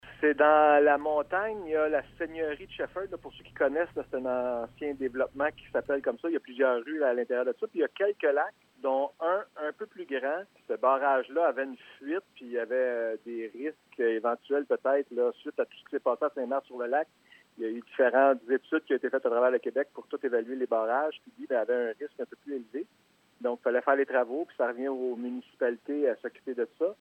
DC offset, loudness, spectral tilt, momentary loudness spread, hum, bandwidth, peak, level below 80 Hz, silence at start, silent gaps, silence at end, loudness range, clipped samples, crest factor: under 0.1%; -30 LUFS; -6.5 dB/octave; 12 LU; none; 8 kHz; -10 dBFS; -68 dBFS; 0.05 s; none; 0.05 s; 4 LU; under 0.1%; 20 dB